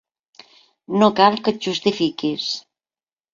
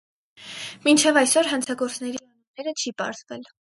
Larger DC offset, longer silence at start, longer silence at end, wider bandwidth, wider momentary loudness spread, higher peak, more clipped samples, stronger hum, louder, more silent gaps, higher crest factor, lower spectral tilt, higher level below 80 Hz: neither; first, 0.9 s vs 0.4 s; first, 0.75 s vs 0.25 s; second, 7.6 kHz vs 12 kHz; second, 11 LU vs 20 LU; about the same, -2 dBFS vs -2 dBFS; neither; neither; first, -19 LUFS vs -22 LUFS; second, none vs 2.47-2.54 s; about the same, 20 dB vs 22 dB; first, -5 dB/octave vs -1.5 dB/octave; first, -64 dBFS vs -76 dBFS